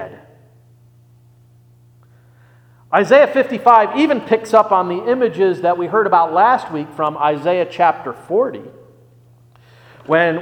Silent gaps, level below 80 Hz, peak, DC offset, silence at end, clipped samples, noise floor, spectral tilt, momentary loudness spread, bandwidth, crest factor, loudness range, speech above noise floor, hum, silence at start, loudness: none; -64 dBFS; 0 dBFS; under 0.1%; 0 s; under 0.1%; -49 dBFS; -6 dB/octave; 9 LU; 11.5 kHz; 16 dB; 6 LU; 34 dB; none; 0 s; -15 LUFS